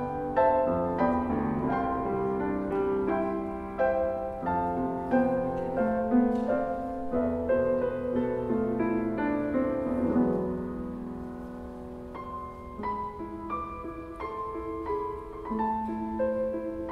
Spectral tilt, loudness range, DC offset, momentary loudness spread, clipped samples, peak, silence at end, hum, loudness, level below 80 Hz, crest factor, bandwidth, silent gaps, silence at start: -9.5 dB/octave; 9 LU; under 0.1%; 12 LU; under 0.1%; -12 dBFS; 0 s; none; -30 LUFS; -48 dBFS; 18 dB; 5.4 kHz; none; 0 s